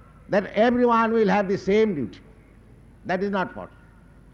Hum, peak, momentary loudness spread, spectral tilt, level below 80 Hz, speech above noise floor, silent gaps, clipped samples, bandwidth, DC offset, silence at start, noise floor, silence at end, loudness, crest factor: none; -10 dBFS; 15 LU; -7 dB/octave; -52 dBFS; 28 dB; none; under 0.1%; 7.4 kHz; under 0.1%; 0.3 s; -50 dBFS; 0.65 s; -22 LUFS; 14 dB